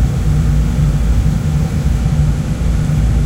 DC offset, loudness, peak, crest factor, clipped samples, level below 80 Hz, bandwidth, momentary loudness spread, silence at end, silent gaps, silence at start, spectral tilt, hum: under 0.1%; -15 LUFS; -2 dBFS; 12 dB; under 0.1%; -16 dBFS; 15 kHz; 2 LU; 0 s; none; 0 s; -7.5 dB/octave; none